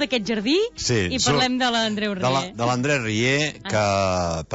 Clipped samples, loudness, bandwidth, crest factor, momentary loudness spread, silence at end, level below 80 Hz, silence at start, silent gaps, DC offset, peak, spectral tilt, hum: under 0.1%; -21 LUFS; 8 kHz; 12 dB; 4 LU; 0 s; -48 dBFS; 0 s; none; under 0.1%; -10 dBFS; -4 dB/octave; none